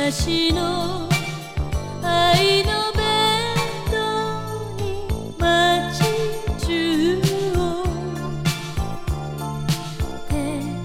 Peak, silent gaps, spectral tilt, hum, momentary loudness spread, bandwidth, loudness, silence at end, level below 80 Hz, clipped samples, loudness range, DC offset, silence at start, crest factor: -6 dBFS; none; -4.5 dB/octave; none; 11 LU; 17 kHz; -21 LUFS; 0 s; -32 dBFS; under 0.1%; 4 LU; under 0.1%; 0 s; 16 dB